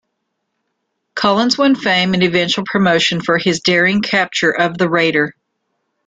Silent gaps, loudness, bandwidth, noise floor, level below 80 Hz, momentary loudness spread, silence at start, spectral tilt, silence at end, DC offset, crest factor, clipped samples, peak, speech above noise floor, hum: none; -14 LUFS; 9.2 kHz; -72 dBFS; -56 dBFS; 4 LU; 1.15 s; -4.5 dB/octave; 0.75 s; under 0.1%; 14 dB; under 0.1%; -2 dBFS; 58 dB; none